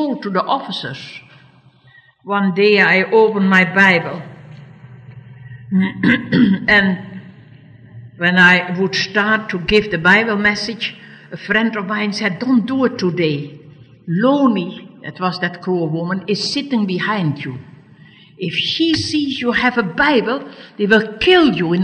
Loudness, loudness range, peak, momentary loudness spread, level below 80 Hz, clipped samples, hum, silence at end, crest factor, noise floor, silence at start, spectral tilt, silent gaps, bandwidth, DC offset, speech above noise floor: -15 LUFS; 5 LU; 0 dBFS; 16 LU; -48 dBFS; under 0.1%; none; 0 s; 16 dB; -49 dBFS; 0 s; -5.5 dB/octave; none; 9.6 kHz; under 0.1%; 33 dB